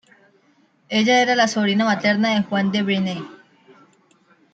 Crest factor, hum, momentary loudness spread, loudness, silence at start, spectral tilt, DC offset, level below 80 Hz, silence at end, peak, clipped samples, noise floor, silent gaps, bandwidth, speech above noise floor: 16 dB; none; 9 LU; -19 LUFS; 0.9 s; -4.5 dB/octave; under 0.1%; -68 dBFS; 1.2 s; -6 dBFS; under 0.1%; -59 dBFS; none; 8 kHz; 40 dB